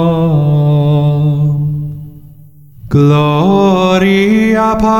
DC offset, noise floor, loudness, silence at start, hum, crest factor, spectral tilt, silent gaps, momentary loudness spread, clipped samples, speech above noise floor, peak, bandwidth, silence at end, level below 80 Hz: under 0.1%; -38 dBFS; -10 LUFS; 0 s; none; 10 dB; -8 dB/octave; none; 7 LU; under 0.1%; 29 dB; 0 dBFS; 7.4 kHz; 0 s; -36 dBFS